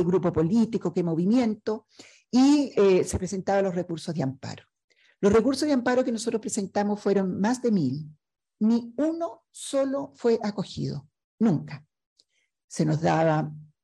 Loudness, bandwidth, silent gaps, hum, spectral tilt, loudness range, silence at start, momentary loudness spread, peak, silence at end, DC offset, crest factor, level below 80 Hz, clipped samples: -25 LUFS; 12.5 kHz; 4.84-4.88 s, 11.24-11.38 s, 12.06-12.16 s, 12.64-12.68 s; none; -6.5 dB/octave; 4 LU; 0 s; 14 LU; -10 dBFS; 0.2 s; under 0.1%; 16 dB; -56 dBFS; under 0.1%